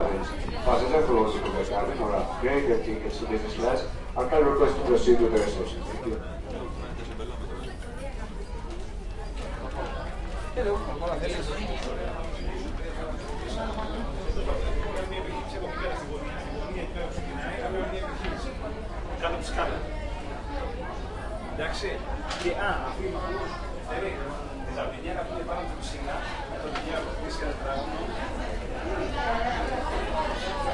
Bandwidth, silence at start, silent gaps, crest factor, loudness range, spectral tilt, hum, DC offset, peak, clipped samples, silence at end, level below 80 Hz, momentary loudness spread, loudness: 11.5 kHz; 0 s; none; 22 dB; 8 LU; -5.5 dB/octave; none; under 0.1%; -8 dBFS; under 0.1%; 0 s; -34 dBFS; 12 LU; -30 LUFS